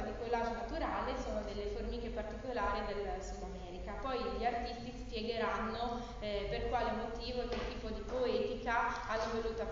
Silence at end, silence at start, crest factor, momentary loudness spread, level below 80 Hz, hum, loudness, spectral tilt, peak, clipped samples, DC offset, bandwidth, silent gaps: 0 s; 0 s; 18 dB; 8 LU; -48 dBFS; none; -39 LUFS; -3.5 dB/octave; -22 dBFS; under 0.1%; under 0.1%; 7.6 kHz; none